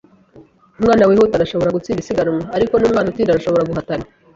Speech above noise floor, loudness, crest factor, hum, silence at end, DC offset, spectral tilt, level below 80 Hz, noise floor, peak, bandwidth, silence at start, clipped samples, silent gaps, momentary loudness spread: 31 dB; -16 LUFS; 14 dB; none; 0.3 s; under 0.1%; -7 dB/octave; -44 dBFS; -46 dBFS; -2 dBFS; 7.8 kHz; 0.35 s; under 0.1%; none; 10 LU